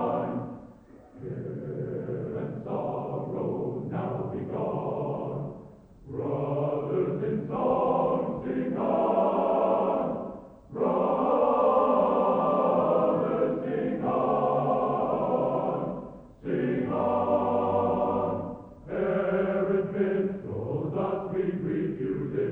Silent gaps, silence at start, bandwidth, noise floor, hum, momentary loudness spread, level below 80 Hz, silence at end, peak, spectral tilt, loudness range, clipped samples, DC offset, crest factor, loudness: none; 0 s; 4.3 kHz; -51 dBFS; none; 12 LU; -58 dBFS; 0 s; -12 dBFS; -10.5 dB/octave; 8 LU; under 0.1%; under 0.1%; 16 dB; -28 LUFS